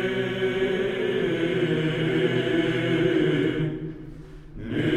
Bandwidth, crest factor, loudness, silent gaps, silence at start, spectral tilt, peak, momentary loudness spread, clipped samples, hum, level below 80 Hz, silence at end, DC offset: 10.5 kHz; 14 dB; -24 LUFS; none; 0 s; -7 dB/octave; -10 dBFS; 16 LU; under 0.1%; none; -48 dBFS; 0 s; under 0.1%